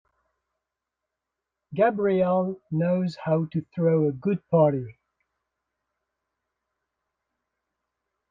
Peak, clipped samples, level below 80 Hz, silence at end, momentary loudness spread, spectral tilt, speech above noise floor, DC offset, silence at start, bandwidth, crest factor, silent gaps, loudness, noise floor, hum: -10 dBFS; under 0.1%; -68 dBFS; 3.4 s; 9 LU; -10 dB/octave; 62 dB; under 0.1%; 1.7 s; 7.4 kHz; 18 dB; none; -24 LUFS; -86 dBFS; none